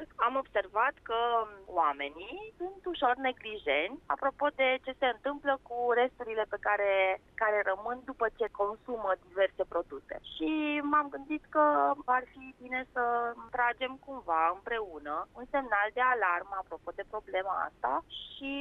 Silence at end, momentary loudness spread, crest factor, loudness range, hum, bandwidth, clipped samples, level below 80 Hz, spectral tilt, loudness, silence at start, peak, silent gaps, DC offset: 0 s; 11 LU; 16 dB; 2 LU; none; 4.7 kHz; under 0.1%; -62 dBFS; -5.5 dB/octave; -32 LUFS; 0 s; -16 dBFS; none; under 0.1%